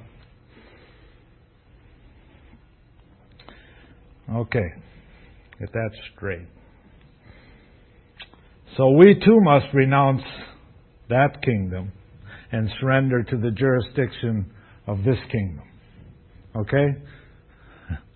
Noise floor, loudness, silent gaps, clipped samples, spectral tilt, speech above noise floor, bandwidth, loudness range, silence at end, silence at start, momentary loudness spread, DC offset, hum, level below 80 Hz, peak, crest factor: -54 dBFS; -21 LUFS; none; under 0.1%; -11.5 dB/octave; 35 dB; 4.4 kHz; 17 LU; 0.15 s; 4.25 s; 21 LU; under 0.1%; none; -46 dBFS; 0 dBFS; 24 dB